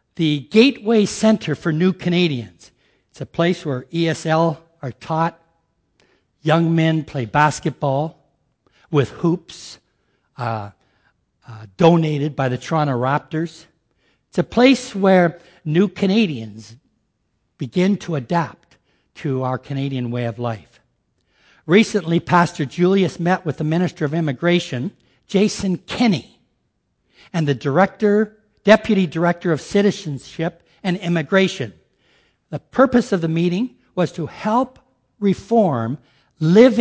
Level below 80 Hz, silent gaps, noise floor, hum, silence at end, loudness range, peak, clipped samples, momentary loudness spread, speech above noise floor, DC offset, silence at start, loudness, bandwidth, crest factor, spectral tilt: -54 dBFS; none; -69 dBFS; none; 0 s; 5 LU; 0 dBFS; under 0.1%; 14 LU; 51 dB; under 0.1%; 0.2 s; -19 LUFS; 8 kHz; 20 dB; -6.5 dB/octave